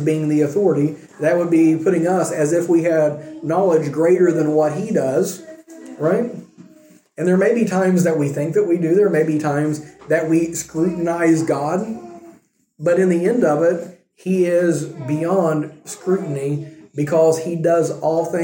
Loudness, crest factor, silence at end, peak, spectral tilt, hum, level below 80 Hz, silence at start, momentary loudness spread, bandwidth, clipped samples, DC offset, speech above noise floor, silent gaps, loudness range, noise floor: -18 LUFS; 14 dB; 0 s; -4 dBFS; -7 dB/octave; none; -64 dBFS; 0 s; 9 LU; 17 kHz; under 0.1%; under 0.1%; 34 dB; none; 3 LU; -51 dBFS